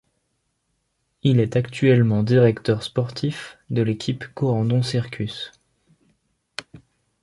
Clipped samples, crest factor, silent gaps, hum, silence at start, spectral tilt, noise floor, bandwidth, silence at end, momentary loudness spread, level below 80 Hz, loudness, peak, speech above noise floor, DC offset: under 0.1%; 18 dB; none; none; 1.25 s; -7.5 dB/octave; -73 dBFS; 11.5 kHz; 0.45 s; 18 LU; -54 dBFS; -21 LUFS; -4 dBFS; 52 dB; under 0.1%